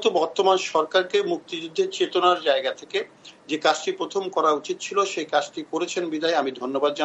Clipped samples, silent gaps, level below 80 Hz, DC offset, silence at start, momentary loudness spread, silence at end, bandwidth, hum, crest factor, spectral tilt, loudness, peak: under 0.1%; none; -78 dBFS; under 0.1%; 0 s; 9 LU; 0 s; 8.4 kHz; none; 18 dB; -3 dB/octave; -24 LUFS; -6 dBFS